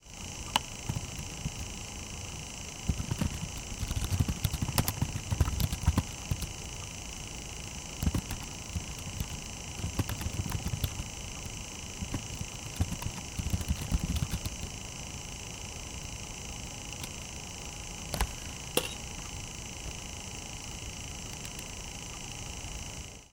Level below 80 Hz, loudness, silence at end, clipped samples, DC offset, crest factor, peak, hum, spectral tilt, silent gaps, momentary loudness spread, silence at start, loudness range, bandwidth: -42 dBFS; -36 LUFS; 0.05 s; under 0.1%; under 0.1%; 28 dB; -8 dBFS; none; -3.5 dB/octave; none; 8 LU; 0 s; 7 LU; 18 kHz